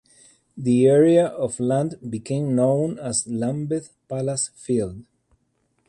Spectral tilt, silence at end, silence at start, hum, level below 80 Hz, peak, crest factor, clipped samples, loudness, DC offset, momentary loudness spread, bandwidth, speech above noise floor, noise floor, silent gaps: -6 dB/octave; 0.85 s; 0.55 s; none; -58 dBFS; -6 dBFS; 16 dB; under 0.1%; -22 LUFS; under 0.1%; 13 LU; 11.5 kHz; 48 dB; -69 dBFS; none